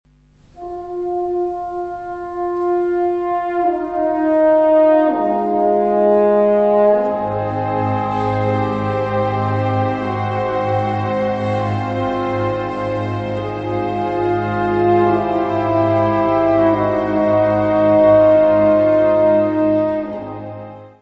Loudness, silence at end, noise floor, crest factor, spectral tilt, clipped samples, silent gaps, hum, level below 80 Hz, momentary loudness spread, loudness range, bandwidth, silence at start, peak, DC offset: -16 LUFS; 0.1 s; -50 dBFS; 14 dB; -9 dB/octave; under 0.1%; none; none; -46 dBFS; 11 LU; 7 LU; 6.6 kHz; 0.55 s; -2 dBFS; under 0.1%